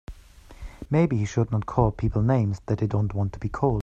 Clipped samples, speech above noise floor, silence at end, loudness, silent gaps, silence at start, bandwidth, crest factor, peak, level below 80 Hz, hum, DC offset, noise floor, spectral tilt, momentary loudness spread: under 0.1%; 24 dB; 0 s; -25 LUFS; none; 0.1 s; 7.6 kHz; 20 dB; -6 dBFS; -40 dBFS; none; under 0.1%; -47 dBFS; -8.5 dB/octave; 7 LU